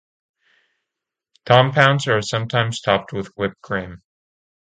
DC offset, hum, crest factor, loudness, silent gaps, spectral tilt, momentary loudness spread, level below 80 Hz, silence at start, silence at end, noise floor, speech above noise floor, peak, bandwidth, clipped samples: under 0.1%; none; 22 dB; -19 LUFS; none; -5 dB/octave; 12 LU; -54 dBFS; 1.45 s; 0.7 s; -84 dBFS; 65 dB; 0 dBFS; 9.2 kHz; under 0.1%